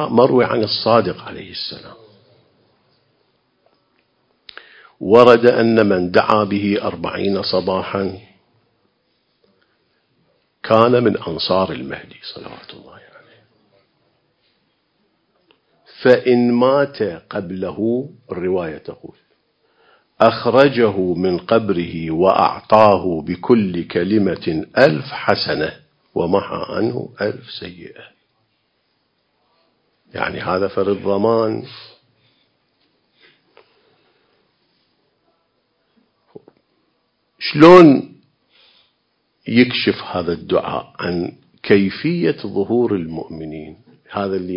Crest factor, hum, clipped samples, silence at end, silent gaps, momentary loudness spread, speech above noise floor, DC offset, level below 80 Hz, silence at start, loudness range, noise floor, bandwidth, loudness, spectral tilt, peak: 18 dB; none; 0.2%; 0 s; none; 18 LU; 51 dB; under 0.1%; -50 dBFS; 0 s; 12 LU; -67 dBFS; 8 kHz; -16 LUFS; -7.5 dB/octave; 0 dBFS